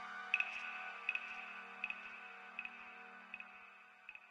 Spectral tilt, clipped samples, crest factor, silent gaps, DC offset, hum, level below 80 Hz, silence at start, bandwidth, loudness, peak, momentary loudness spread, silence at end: -1.5 dB/octave; under 0.1%; 28 dB; none; under 0.1%; none; -88 dBFS; 0 s; 12 kHz; -44 LUFS; -20 dBFS; 18 LU; 0 s